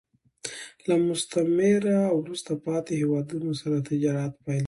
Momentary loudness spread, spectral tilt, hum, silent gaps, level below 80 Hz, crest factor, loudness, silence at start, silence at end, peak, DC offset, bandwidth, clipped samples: 12 LU; -6 dB/octave; none; none; -66 dBFS; 14 dB; -26 LUFS; 0.45 s; 0 s; -12 dBFS; under 0.1%; 11.5 kHz; under 0.1%